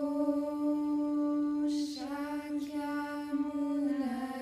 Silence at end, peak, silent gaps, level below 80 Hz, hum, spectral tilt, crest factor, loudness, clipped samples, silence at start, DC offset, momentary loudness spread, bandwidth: 0 s; -20 dBFS; none; -68 dBFS; none; -5 dB/octave; 14 dB; -34 LUFS; under 0.1%; 0 s; under 0.1%; 5 LU; 13 kHz